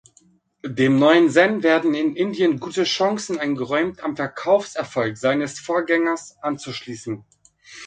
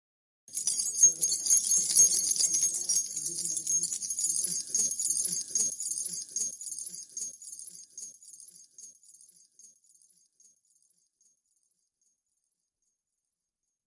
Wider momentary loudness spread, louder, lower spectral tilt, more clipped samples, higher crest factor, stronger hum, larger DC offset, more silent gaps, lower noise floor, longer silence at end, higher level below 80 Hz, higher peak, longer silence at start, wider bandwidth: second, 16 LU vs 21 LU; first, -20 LUFS vs -26 LUFS; first, -5 dB/octave vs 1.5 dB/octave; neither; about the same, 20 dB vs 22 dB; neither; neither; neither; second, -58 dBFS vs -87 dBFS; second, 0 s vs 4.2 s; first, -64 dBFS vs -88 dBFS; first, -2 dBFS vs -10 dBFS; first, 0.65 s vs 0.5 s; second, 9.4 kHz vs 12 kHz